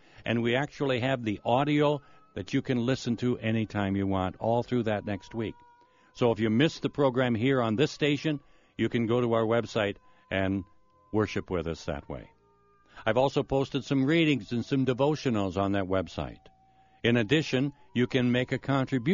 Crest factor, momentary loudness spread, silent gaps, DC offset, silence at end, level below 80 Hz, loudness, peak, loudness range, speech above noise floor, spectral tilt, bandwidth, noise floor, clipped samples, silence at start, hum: 18 dB; 10 LU; none; under 0.1%; 0 s; -56 dBFS; -28 LUFS; -10 dBFS; 4 LU; 36 dB; -5 dB/octave; 7.2 kHz; -64 dBFS; under 0.1%; 0.2 s; none